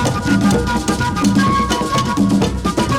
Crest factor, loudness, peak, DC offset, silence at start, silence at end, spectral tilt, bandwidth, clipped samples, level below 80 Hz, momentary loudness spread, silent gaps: 12 dB; -16 LUFS; -4 dBFS; under 0.1%; 0 s; 0 s; -5.5 dB/octave; 16.5 kHz; under 0.1%; -30 dBFS; 3 LU; none